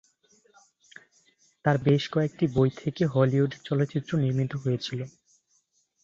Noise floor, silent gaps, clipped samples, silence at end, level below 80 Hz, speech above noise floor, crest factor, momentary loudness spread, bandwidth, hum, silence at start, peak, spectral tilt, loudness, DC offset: -70 dBFS; none; under 0.1%; 0.95 s; -60 dBFS; 45 dB; 20 dB; 7 LU; 7.4 kHz; none; 1.65 s; -8 dBFS; -7.5 dB/octave; -26 LUFS; under 0.1%